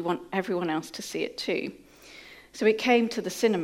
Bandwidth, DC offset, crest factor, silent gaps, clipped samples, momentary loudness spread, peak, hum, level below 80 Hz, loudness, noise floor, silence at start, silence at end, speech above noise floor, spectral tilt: 16.5 kHz; under 0.1%; 18 dB; none; under 0.1%; 23 LU; -10 dBFS; none; -68 dBFS; -27 LUFS; -49 dBFS; 0 s; 0 s; 22 dB; -4.5 dB/octave